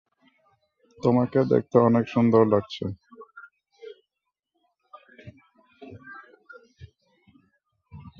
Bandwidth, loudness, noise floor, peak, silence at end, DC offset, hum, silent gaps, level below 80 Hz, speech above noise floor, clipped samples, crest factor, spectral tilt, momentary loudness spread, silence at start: 6.8 kHz; -22 LUFS; -84 dBFS; -4 dBFS; 0.1 s; under 0.1%; none; none; -60 dBFS; 63 dB; under 0.1%; 22 dB; -9 dB/octave; 27 LU; 1.05 s